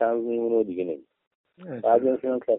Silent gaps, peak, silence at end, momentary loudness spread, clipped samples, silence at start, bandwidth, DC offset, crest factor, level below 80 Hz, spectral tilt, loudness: 1.27-1.44 s; -8 dBFS; 0 s; 13 LU; under 0.1%; 0 s; 3.8 kHz; under 0.1%; 18 dB; -72 dBFS; -7 dB/octave; -25 LUFS